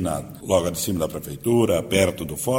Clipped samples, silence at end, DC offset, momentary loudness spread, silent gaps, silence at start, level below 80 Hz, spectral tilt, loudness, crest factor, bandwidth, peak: under 0.1%; 0 s; under 0.1%; 8 LU; none; 0 s; -46 dBFS; -5 dB/octave; -23 LUFS; 18 dB; 17 kHz; -4 dBFS